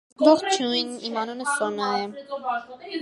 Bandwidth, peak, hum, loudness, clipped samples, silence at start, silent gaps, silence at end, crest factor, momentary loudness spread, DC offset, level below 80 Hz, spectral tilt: 11.5 kHz; -2 dBFS; none; -24 LUFS; under 0.1%; 0.2 s; none; 0 s; 22 dB; 13 LU; under 0.1%; -76 dBFS; -3 dB/octave